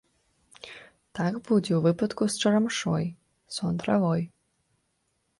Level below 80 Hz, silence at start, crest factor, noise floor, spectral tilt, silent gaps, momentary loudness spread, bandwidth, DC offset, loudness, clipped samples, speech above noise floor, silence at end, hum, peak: -62 dBFS; 0.65 s; 16 dB; -74 dBFS; -5.5 dB/octave; none; 20 LU; 11.5 kHz; under 0.1%; -27 LUFS; under 0.1%; 49 dB; 1.15 s; none; -12 dBFS